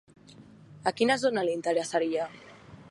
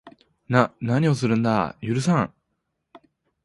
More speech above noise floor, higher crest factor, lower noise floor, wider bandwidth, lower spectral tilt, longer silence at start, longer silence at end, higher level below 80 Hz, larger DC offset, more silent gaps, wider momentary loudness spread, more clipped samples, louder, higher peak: second, 25 dB vs 55 dB; about the same, 20 dB vs 22 dB; second, -52 dBFS vs -77 dBFS; about the same, 11.5 kHz vs 11.5 kHz; second, -4 dB/octave vs -7 dB/octave; first, 0.3 s vs 0.05 s; second, 0 s vs 1.15 s; second, -70 dBFS vs -56 dBFS; neither; neither; first, 9 LU vs 4 LU; neither; second, -28 LUFS vs -22 LUFS; second, -10 dBFS vs -2 dBFS